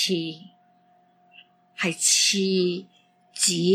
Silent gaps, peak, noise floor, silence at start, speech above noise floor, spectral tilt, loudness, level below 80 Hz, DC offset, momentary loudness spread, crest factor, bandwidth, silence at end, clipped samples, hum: none; -6 dBFS; -61 dBFS; 0 s; 38 dB; -2.5 dB/octave; -22 LUFS; -82 dBFS; under 0.1%; 17 LU; 20 dB; 16 kHz; 0 s; under 0.1%; none